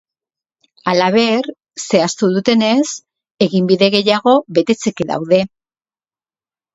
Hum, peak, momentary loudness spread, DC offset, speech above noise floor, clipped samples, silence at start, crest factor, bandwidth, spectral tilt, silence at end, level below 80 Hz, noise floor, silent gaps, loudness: none; 0 dBFS; 10 LU; under 0.1%; over 76 dB; under 0.1%; 0.85 s; 16 dB; 8 kHz; -5 dB/octave; 1.25 s; -58 dBFS; under -90 dBFS; 3.31-3.35 s; -15 LUFS